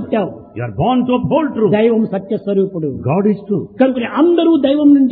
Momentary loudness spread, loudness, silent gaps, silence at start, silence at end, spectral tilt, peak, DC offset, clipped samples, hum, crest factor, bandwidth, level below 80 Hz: 9 LU; -15 LUFS; none; 0 s; 0 s; -11.5 dB/octave; 0 dBFS; under 0.1%; under 0.1%; none; 14 dB; 4.1 kHz; -48 dBFS